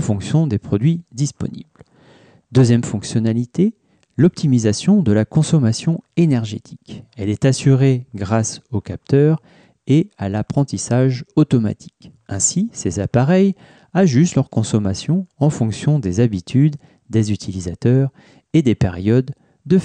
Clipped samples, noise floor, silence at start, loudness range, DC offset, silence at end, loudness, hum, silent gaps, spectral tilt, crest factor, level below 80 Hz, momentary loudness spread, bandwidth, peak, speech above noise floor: under 0.1%; -49 dBFS; 0 s; 2 LU; under 0.1%; 0 s; -18 LUFS; none; none; -6.5 dB/octave; 14 dB; -48 dBFS; 12 LU; 10 kHz; -4 dBFS; 33 dB